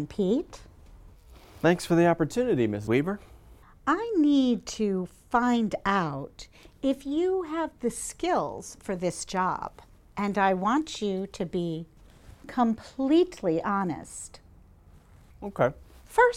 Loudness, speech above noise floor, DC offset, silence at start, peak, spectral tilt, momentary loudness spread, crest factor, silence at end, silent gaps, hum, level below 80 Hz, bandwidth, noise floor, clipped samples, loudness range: -27 LUFS; 27 dB; under 0.1%; 0 s; -8 dBFS; -5.5 dB/octave; 15 LU; 20 dB; 0 s; none; none; -54 dBFS; 15.5 kHz; -54 dBFS; under 0.1%; 4 LU